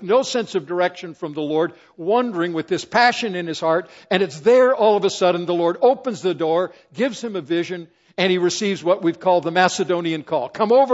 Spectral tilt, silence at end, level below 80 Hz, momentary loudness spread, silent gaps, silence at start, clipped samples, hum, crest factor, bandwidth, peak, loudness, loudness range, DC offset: -4.5 dB/octave; 0 s; -68 dBFS; 9 LU; none; 0 s; under 0.1%; none; 20 dB; 8 kHz; 0 dBFS; -20 LUFS; 3 LU; under 0.1%